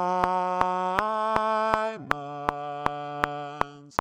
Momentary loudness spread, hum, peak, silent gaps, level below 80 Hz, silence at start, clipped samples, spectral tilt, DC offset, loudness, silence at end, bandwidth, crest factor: 6 LU; none; -2 dBFS; none; -54 dBFS; 0 s; under 0.1%; -5.5 dB/octave; under 0.1%; -27 LUFS; 0.05 s; over 20 kHz; 26 dB